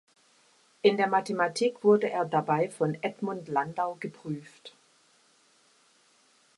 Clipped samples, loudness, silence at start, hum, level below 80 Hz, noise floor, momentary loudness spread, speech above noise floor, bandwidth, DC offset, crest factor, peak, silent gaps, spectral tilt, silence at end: under 0.1%; -28 LUFS; 0.85 s; none; -78 dBFS; -64 dBFS; 15 LU; 37 dB; 11.5 kHz; under 0.1%; 22 dB; -8 dBFS; none; -5.5 dB/octave; 1.9 s